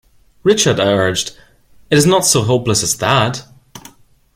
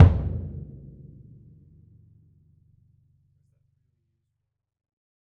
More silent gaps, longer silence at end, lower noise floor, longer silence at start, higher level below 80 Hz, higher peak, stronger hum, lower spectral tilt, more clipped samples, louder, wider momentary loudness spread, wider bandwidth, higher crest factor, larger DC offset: neither; second, 0.55 s vs 4.7 s; second, -44 dBFS vs -81 dBFS; first, 0.45 s vs 0 s; second, -46 dBFS vs -38 dBFS; about the same, 0 dBFS vs -2 dBFS; neither; second, -3.5 dB/octave vs -10.5 dB/octave; neither; first, -14 LUFS vs -25 LUFS; second, 9 LU vs 26 LU; first, 16.5 kHz vs 3.6 kHz; second, 16 dB vs 26 dB; neither